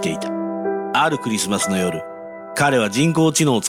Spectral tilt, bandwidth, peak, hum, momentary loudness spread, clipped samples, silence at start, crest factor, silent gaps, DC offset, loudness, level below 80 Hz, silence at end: -4 dB/octave; 16.5 kHz; -6 dBFS; none; 11 LU; under 0.1%; 0 s; 14 dB; none; under 0.1%; -19 LUFS; -56 dBFS; 0 s